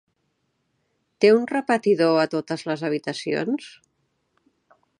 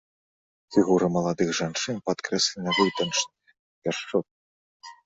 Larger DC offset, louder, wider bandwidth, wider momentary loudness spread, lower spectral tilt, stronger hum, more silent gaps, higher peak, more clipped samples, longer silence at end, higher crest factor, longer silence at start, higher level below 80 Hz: neither; first, -22 LUFS vs -25 LUFS; first, 10.5 kHz vs 8.4 kHz; about the same, 10 LU vs 8 LU; first, -5.5 dB/octave vs -4 dB/octave; neither; second, none vs 3.59-3.82 s, 4.31-4.80 s; about the same, -4 dBFS vs -6 dBFS; neither; first, 1.3 s vs 0.15 s; about the same, 22 dB vs 20 dB; first, 1.2 s vs 0.7 s; second, -76 dBFS vs -62 dBFS